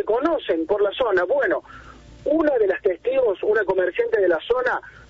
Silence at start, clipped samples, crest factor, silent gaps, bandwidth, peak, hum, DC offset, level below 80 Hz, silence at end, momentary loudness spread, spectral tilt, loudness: 0 s; under 0.1%; 14 dB; none; 7.2 kHz; -8 dBFS; none; under 0.1%; -52 dBFS; 0.1 s; 4 LU; -6 dB/octave; -21 LUFS